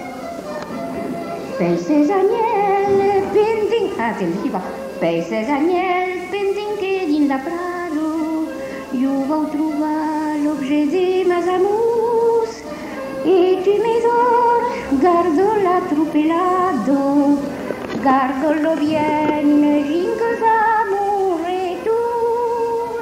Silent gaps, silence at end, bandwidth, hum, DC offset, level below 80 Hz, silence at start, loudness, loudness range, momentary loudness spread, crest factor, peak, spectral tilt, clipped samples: none; 0 s; 15.5 kHz; none; under 0.1%; -52 dBFS; 0 s; -18 LUFS; 4 LU; 10 LU; 14 dB; -4 dBFS; -6 dB/octave; under 0.1%